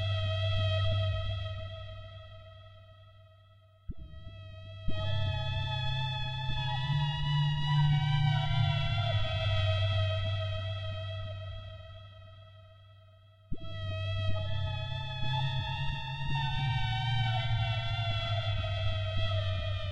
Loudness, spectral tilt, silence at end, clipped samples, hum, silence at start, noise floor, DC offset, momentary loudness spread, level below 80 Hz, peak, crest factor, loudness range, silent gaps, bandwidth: -32 LUFS; -6.5 dB/octave; 0 s; under 0.1%; none; 0 s; -59 dBFS; under 0.1%; 18 LU; -44 dBFS; -18 dBFS; 14 dB; 13 LU; none; 7.4 kHz